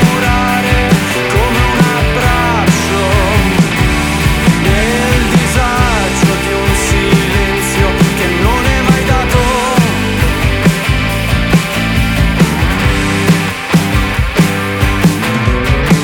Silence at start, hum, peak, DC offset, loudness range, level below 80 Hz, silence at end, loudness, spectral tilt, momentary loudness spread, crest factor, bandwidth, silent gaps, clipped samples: 0 s; none; 0 dBFS; under 0.1%; 1 LU; -18 dBFS; 0 s; -11 LUFS; -5 dB/octave; 3 LU; 10 dB; 19 kHz; none; under 0.1%